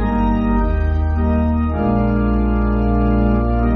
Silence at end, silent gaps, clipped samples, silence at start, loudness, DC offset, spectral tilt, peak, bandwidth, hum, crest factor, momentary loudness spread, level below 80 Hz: 0 s; none; under 0.1%; 0 s; -17 LUFS; under 0.1%; -9 dB/octave; -4 dBFS; 4.4 kHz; none; 10 dB; 2 LU; -20 dBFS